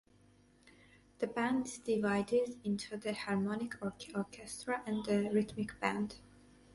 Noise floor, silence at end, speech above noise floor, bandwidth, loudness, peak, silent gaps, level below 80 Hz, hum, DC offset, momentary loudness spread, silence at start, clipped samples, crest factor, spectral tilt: -66 dBFS; 0.55 s; 30 dB; 11.5 kHz; -37 LUFS; -18 dBFS; none; -68 dBFS; none; under 0.1%; 9 LU; 0.65 s; under 0.1%; 20 dB; -5.5 dB/octave